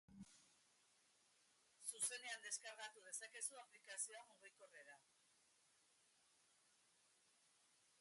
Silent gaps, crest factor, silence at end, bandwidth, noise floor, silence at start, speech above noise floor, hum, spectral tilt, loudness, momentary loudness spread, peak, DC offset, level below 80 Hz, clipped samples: none; 26 dB; 0.35 s; 11.5 kHz; -79 dBFS; 0.1 s; 23 dB; none; 0.5 dB/octave; -50 LUFS; 20 LU; -30 dBFS; under 0.1%; under -90 dBFS; under 0.1%